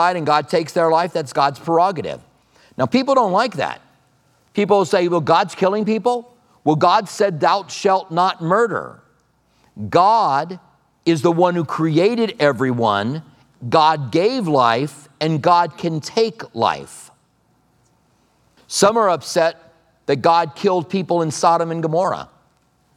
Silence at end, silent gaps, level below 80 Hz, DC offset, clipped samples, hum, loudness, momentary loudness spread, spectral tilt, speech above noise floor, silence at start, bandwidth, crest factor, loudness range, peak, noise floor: 0.75 s; none; -66 dBFS; under 0.1%; under 0.1%; none; -18 LUFS; 11 LU; -5 dB/octave; 43 dB; 0 s; 15 kHz; 18 dB; 4 LU; 0 dBFS; -60 dBFS